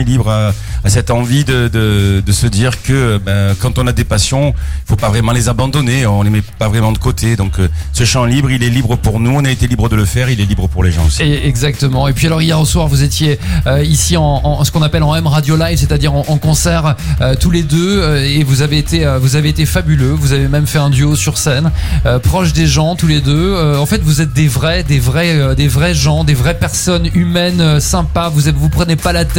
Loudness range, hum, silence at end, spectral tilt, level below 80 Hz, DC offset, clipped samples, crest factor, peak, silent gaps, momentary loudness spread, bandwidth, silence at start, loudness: 1 LU; none; 0 s; -5 dB/octave; -22 dBFS; under 0.1%; under 0.1%; 10 dB; 0 dBFS; none; 3 LU; 17 kHz; 0 s; -12 LUFS